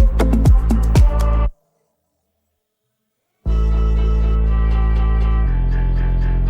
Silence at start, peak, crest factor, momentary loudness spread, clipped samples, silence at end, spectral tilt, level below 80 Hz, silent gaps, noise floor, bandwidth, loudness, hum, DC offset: 0 s; -4 dBFS; 12 dB; 6 LU; under 0.1%; 0 s; -8 dB/octave; -16 dBFS; none; -73 dBFS; 9.6 kHz; -18 LUFS; none; under 0.1%